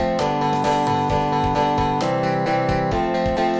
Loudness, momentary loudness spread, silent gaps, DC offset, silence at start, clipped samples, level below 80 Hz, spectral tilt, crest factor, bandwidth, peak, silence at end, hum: -20 LUFS; 1 LU; none; under 0.1%; 0 s; under 0.1%; -36 dBFS; -6.5 dB/octave; 12 dB; 8 kHz; -6 dBFS; 0 s; none